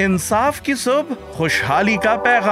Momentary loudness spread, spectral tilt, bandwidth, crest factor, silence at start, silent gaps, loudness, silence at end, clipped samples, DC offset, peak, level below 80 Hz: 5 LU; -4.5 dB/octave; 16 kHz; 14 dB; 0 s; none; -17 LUFS; 0 s; under 0.1%; under 0.1%; -4 dBFS; -44 dBFS